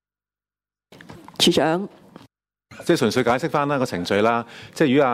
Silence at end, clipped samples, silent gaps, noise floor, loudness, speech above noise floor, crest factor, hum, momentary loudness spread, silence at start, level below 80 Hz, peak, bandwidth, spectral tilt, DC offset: 0 s; under 0.1%; none; under -90 dBFS; -20 LUFS; over 70 dB; 18 dB; 50 Hz at -55 dBFS; 13 LU; 1.1 s; -60 dBFS; -6 dBFS; 16 kHz; -4.5 dB/octave; under 0.1%